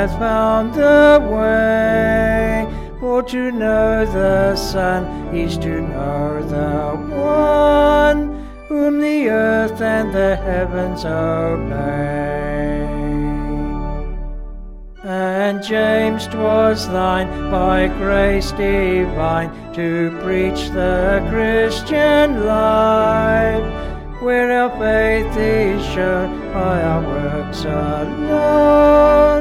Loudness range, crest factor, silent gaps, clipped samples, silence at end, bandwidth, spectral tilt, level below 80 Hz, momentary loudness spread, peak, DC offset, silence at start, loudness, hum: 5 LU; 14 dB; none; under 0.1%; 0 s; 15 kHz; -6.5 dB/octave; -28 dBFS; 10 LU; -2 dBFS; under 0.1%; 0 s; -16 LUFS; none